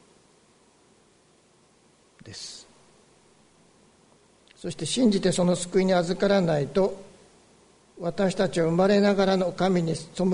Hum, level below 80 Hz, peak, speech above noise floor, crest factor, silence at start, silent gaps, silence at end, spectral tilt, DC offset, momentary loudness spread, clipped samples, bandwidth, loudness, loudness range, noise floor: none; -56 dBFS; -10 dBFS; 37 dB; 16 dB; 2.25 s; none; 0 s; -5.5 dB/octave; under 0.1%; 18 LU; under 0.1%; 10.5 kHz; -24 LUFS; 22 LU; -61 dBFS